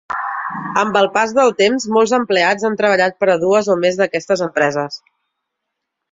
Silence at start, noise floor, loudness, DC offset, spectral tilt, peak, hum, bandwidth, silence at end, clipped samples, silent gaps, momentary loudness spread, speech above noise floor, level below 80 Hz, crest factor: 0.1 s; -77 dBFS; -16 LUFS; under 0.1%; -4 dB/octave; -2 dBFS; none; 7.8 kHz; 1.15 s; under 0.1%; none; 9 LU; 62 dB; -62 dBFS; 16 dB